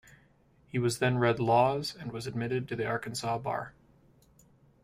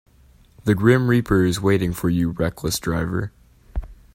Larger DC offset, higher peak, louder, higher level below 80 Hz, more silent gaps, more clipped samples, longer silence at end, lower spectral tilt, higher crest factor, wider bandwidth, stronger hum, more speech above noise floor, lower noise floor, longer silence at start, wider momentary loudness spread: neither; second, -12 dBFS vs -2 dBFS; second, -30 LUFS vs -20 LUFS; second, -62 dBFS vs -38 dBFS; neither; neither; first, 1.15 s vs 0.2 s; about the same, -5.5 dB/octave vs -6 dB/octave; about the same, 20 dB vs 18 dB; about the same, 15.5 kHz vs 16.5 kHz; neither; about the same, 34 dB vs 33 dB; first, -64 dBFS vs -52 dBFS; about the same, 0.75 s vs 0.65 s; second, 12 LU vs 18 LU